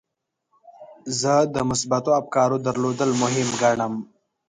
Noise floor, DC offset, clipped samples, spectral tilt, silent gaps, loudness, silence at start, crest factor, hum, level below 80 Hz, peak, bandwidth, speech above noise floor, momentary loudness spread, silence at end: -79 dBFS; under 0.1%; under 0.1%; -4.5 dB/octave; none; -22 LUFS; 0.8 s; 16 dB; none; -58 dBFS; -6 dBFS; 10.5 kHz; 58 dB; 8 LU; 0.45 s